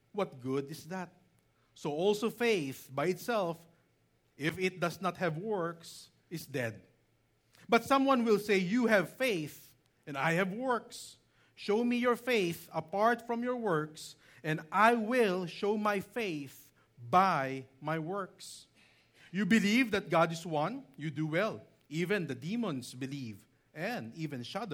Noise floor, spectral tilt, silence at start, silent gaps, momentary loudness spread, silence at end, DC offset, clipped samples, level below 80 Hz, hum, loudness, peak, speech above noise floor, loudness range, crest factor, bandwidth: -72 dBFS; -5.5 dB/octave; 0.15 s; none; 16 LU; 0 s; under 0.1%; under 0.1%; -76 dBFS; none; -33 LUFS; -12 dBFS; 40 dB; 6 LU; 22 dB; 19.5 kHz